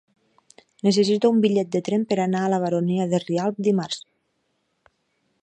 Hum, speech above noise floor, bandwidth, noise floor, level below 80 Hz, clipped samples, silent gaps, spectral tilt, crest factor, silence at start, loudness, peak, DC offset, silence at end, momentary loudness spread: none; 51 dB; 9.4 kHz; -72 dBFS; -70 dBFS; under 0.1%; none; -6 dB/octave; 18 dB; 0.85 s; -22 LUFS; -6 dBFS; under 0.1%; 1.4 s; 7 LU